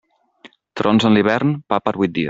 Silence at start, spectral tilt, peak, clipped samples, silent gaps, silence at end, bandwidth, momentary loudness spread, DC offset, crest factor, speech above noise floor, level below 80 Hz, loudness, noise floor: 0.45 s; -7 dB/octave; -2 dBFS; under 0.1%; none; 0 s; 7.8 kHz; 8 LU; under 0.1%; 16 dB; 32 dB; -56 dBFS; -17 LUFS; -48 dBFS